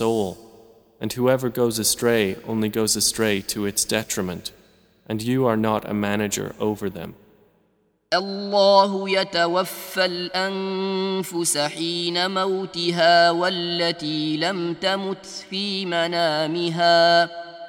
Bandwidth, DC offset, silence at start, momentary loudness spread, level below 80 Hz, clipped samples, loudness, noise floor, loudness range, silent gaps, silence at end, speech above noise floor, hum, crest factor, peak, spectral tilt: over 20 kHz; under 0.1%; 0 s; 11 LU; -58 dBFS; under 0.1%; -21 LUFS; -65 dBFS; 4 LU; none; 0 s; 43 dB; none; 18 dB; -4 dBFS; -3.5 dB/octave